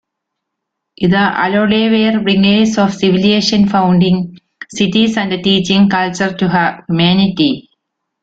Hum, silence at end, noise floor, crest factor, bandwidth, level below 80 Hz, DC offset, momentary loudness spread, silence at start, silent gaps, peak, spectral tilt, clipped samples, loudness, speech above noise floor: none; 0.6 s; -76 dBFS; 12 dB; 8 kHz; -48 dBFS; under 0.1%; 5 LU; 1 s; none; 0 dBFS; -5.5 dB/octave; under 0.1%; -12 LUFS; 64 dB